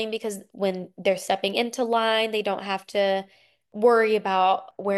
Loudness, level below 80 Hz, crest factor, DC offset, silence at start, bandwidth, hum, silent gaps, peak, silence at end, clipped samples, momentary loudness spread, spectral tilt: -24 LUFS; -74 dBFS; 16 dB; under 0.1%; 0 s; 12.5 kHz; none; none; -8 dBFS; 0 s; under 0.1%; 9 LU; -4 dB/octave